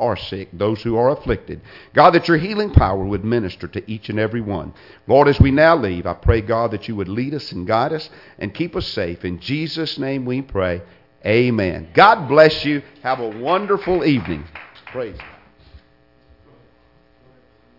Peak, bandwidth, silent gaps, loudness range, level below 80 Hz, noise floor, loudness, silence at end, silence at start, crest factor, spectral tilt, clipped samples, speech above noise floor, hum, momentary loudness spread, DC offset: 0 dBFS; 5.8 kHz; none; 8 LU; -34 dBFS; -55 dBFS; -18 LUFS; 2 s; 0 s; 18 dB; -8 dB/octave; under 0.1%; 37 dB; none; 17 LU; under 0.1%